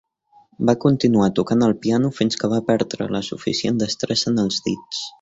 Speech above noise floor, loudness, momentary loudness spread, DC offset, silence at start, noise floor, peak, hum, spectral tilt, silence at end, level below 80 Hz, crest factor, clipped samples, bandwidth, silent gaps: 36 dB; -20 LUFS; 8 LU; under 0.1%; 0.6 s; -55 dBFS; -2 dBFS; none; -5.5 dB/octave; 0.1 s; -54 dBFS; 18 dB; under 0.1%; 8 kHz; none